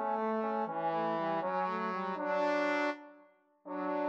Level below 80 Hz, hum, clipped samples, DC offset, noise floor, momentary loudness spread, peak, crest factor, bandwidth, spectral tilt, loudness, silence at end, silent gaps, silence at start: under -90 dBFS; none; under 0.1%; under 0.1%; -64 dBFS; 6 LU; -20 dBFS; 14 dB; 8 kHz; -6.5 dB/octave; -34 LUFS; 0 s; none; 0 s